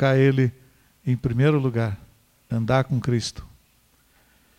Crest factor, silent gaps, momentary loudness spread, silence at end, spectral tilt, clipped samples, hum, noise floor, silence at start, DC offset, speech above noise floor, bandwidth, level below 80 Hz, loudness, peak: 16 dB; none; 13 LU; 1.15 s; -7 dB/octave; under 0.1%; none; -61 dBFS; 0 s; under 0.1%; 40 dB; 10.5 kHz; -50 dBFS; -23 LUFS; -8 dBFS